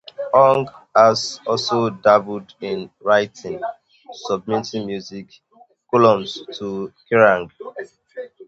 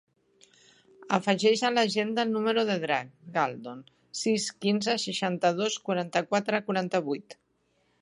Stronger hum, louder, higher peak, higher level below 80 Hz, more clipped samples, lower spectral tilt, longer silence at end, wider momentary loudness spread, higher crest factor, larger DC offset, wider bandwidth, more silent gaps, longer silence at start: neither; first, -18 LUFS vs -28 LUFS; first, 0 dBFS vs -6 dBFS; first, -60 dBFS vs -78 dBFS; neither; about the same, -5 dB/octave vs -4 dB/octave; second, 0.05 s vs 0.7 s; first, 19 LU vs 9 LU; about the same, 20 dB vs 22 dB; neither; second, 8 kHz vs 11.5 kHz; neither; second, 0.2 s vs 1 s